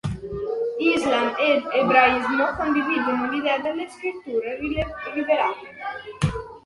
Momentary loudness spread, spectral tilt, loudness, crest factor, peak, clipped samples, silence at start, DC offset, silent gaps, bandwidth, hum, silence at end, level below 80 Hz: 12 LU; -6 dB/octave; -22 LUFS; 20 dB; -2 dBFS; under 0.1%; 0.05 s; under 0.1%; none; 11.5 kHz; none; 0.05 s; -46 dBFS